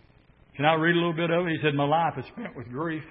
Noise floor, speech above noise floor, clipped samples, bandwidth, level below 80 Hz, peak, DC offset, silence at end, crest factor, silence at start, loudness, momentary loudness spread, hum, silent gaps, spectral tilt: -57 dBFS; 32 dB; under 0.1%; 5.6 kHz; -62 dBFS; -6 dBFS; under 0.1%; 0 s; 20 dB; 0.55 s; -25 LUFS; 14 LU; none; none; -10.5 dB/octave